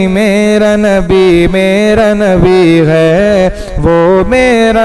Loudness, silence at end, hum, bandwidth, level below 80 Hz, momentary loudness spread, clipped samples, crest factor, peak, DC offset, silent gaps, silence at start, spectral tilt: -8 LUFS; 0 s; none; 12.5 kHz; -24 dBFS; 3 LU; 0.6%; 6 dB; 0 dBFS; 0.3%; none; 0 s; -6.5 dB/octave